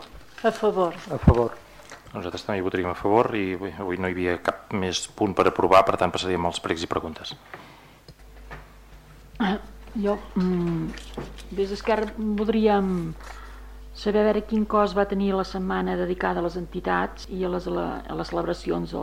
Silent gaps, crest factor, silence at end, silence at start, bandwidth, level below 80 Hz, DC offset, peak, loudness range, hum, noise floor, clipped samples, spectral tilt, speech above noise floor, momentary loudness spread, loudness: none; 20 dB; 0 s; 0 s; 16 kHz; -40 dBFS; under 0.1%; -6 dBFS; 7 LU; none; -49 dBFS; under 0.1%; -6 dB/octave; 24 dB; 17 LU; -25 LUFS